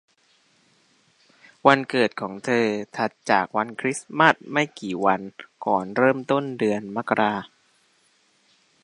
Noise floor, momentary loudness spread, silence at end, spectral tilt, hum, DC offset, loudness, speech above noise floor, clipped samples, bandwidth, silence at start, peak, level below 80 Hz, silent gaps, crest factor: -63 dBFS; 9 LU; 1.35 s; -5 dB/octave; none; under 0.1%; -23 LUFS; 41 dB; under 0.1%; 11.5 kHz; 1.65 s; 0 dBFS; -70 dBFS; none; 24 dB